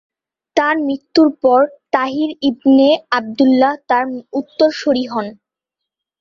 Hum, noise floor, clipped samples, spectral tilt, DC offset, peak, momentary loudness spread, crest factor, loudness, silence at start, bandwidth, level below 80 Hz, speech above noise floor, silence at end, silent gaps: none; -82 dBFS; under 0.1%; -5 dB/octave; under 0.1%; -2 dBFS; 10 LU; 14 dB; -15 LUFS; 0.55 s; 7.2 kHz; -60 dBFS; 67 dB; 0.9 s; none